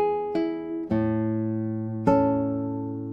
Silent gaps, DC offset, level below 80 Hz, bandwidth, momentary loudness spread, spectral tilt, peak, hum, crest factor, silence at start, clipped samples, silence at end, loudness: none; under 0.1%; -52 dBFS; 6.6 kHz; 8 LU; -10 dB/octave; -6 dBFS; none; 18 dB; 0 s; under 0.1%; 0 s; -26 LUFS